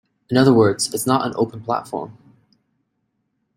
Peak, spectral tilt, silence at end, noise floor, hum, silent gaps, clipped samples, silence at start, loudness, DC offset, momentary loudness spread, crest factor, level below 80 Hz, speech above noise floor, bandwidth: -2 dBFS; -5.5 dB/octave; 1.45 s; -72 dBFS; none; none; under 0.1%; 0.3 s; -18 LUFS; under 0.1%; 16 LU; 20 dB; -58 dBFS; 54 dB; 16 kHz